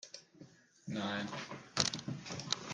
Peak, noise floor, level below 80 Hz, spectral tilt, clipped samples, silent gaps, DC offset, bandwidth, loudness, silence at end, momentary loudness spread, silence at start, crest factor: -10 dBFS; -60 dBFS; -74 dBFS; -3 dB/octave; under 0.1%; none; under 0.1%; 11 kHz; -39 LUFS; 0 s; 19 LU; 0.05 s; 32 dB